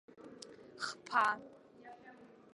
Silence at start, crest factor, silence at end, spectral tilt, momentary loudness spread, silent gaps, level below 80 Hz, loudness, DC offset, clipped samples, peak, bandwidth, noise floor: 0.2 s; 24 dB; 0.3 s; -2 dB/octave; 25 LU; none; -84 dBFS; -36 LUFS; under 0.1%; under 0.1%; -18 dBFS; 11.5 kHz; -58 dBFS